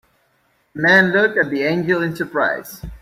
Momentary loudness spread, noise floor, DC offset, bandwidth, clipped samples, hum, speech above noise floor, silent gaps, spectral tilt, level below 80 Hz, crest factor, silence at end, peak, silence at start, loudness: 14 LU; -62 dBFS; under 0.1%; 16 kHz; under 0.1%; none; 45 dB; none; -6 dB/octave; -46 dBFS; 18 dB; 0.05 s; -2 dBFS; 0.75 s; -17 LUFS